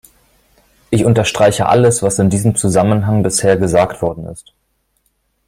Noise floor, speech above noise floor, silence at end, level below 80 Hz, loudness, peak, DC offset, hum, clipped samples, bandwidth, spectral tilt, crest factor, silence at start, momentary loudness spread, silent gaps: -64 dBFS; 51 dB; 1.1 s; -42 dBFS; -13 LUFS; 0 dBFS; under 0.1%; none; under 0.1%; 16 kHz; -5.5 dB/octave; 14 dB; 0.9 s; 9 LU; none